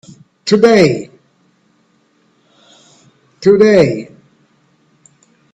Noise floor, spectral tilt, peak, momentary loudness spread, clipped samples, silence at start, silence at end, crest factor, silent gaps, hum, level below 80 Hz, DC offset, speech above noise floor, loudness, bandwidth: -56 dBFS; -6 dB/octave; 0 dBFS; 18 LU; under 0.1%; 0.45 s; 1.5 s; 16 dB; none; none; -54 dBFS; under 0.1%; 47 dB; -11 LUFS; 8.8 kHz